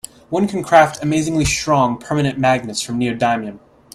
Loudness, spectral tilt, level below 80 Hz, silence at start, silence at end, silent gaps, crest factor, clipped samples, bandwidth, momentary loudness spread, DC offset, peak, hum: -17 LUFS; -5 dB/octave; -40 dBFS; 0.3 s; 0.4 s; none; 18 dB; under 0.1%; 15.5 kHz; 9 LU; under 0.1%; 0 dBFS; none